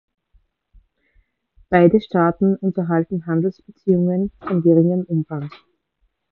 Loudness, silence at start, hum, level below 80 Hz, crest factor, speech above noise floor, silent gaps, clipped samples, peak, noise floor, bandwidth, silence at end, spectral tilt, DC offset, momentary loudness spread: -19 LUFS; 1.7 s; none; -52 dBFS; 18 dB; 50 dB; none; under 0.1%; -2 dBFS; -68 dBFS; 4.4 kHz; 0.75 s; -11.5 dB/octave; under 0.1%; 10 LU